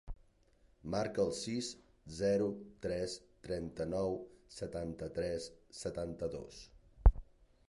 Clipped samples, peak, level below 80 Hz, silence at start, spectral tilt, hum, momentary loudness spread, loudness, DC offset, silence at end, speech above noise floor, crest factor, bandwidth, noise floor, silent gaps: under 0.1%; -12 dBFS; -40 dBFS; 0.05 s; -6 dB/octave; none; 19 LU; -38 LUFS; under 0.1%; 0.5 s; 30 dB; 26 dB; 11.5 kHz; -69 dBFS; none